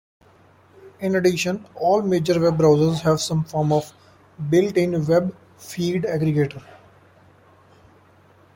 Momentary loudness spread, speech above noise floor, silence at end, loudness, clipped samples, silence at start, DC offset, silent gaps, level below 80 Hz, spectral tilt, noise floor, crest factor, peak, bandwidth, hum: 13 LU; 33 dB; 1.95 s; -21 LUFS; under 0.1%; 0.85 s; under 0.1%; none; -56 dBFS; -6.5 dB/octave; -53 dBFS; 18 dB; -4 dBFS; 16.5 kHz; none